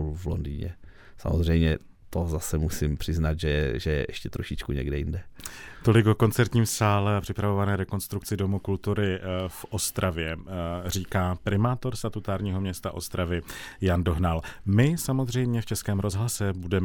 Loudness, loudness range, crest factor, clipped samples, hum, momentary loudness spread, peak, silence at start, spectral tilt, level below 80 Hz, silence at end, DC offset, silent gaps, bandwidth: -27 LUFS; 4 LU; 20 dB; under 0.1%; none; 10 LU; -6 dBFS; 0 s; -6 dB/octave; -40 dBFS; 0 s; under 0.1%; none; 19 kHz